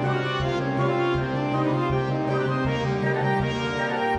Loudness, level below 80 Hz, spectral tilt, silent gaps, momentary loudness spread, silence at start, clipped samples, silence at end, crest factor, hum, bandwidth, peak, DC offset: -24 LUFS; -44 dBFS; -7 dB/octave; none; 2 LU; 0 s; under 0.1%; 0 s; 12 dB; none; 10 kHz; -10 dBFS; under 0.1%